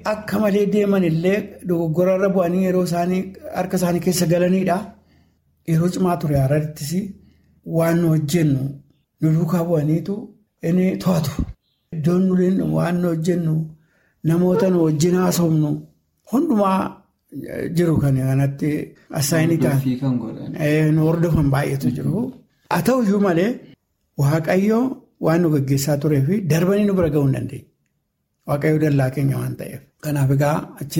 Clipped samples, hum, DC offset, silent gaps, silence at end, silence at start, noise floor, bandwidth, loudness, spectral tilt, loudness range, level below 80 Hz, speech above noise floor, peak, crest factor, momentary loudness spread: under 0.1%; none; under 0.1%; none; 0 s; 0 s; -72 dBFS; 16.5 kHz; -20 LUFS; -7 dB/octave; 2 LU; -46 dBFS; 53 dB; -4 dBFS; 14 dB; 11 LU